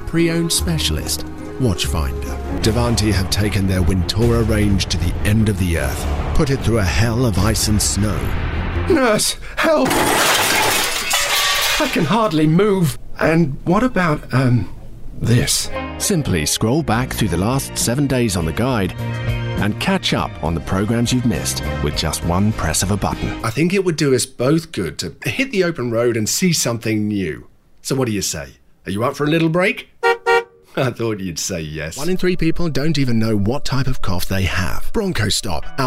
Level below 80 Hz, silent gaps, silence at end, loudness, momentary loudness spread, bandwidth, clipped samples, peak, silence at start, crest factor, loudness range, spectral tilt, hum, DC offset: -28 dBFS; none; 0 s; -18 LUFS; 8 LU; 16 kHz; under 0.1%; -4 dBFS; 0 s; 14 dB; 5 LU; -4.5 dB/octave; none; under 0.1%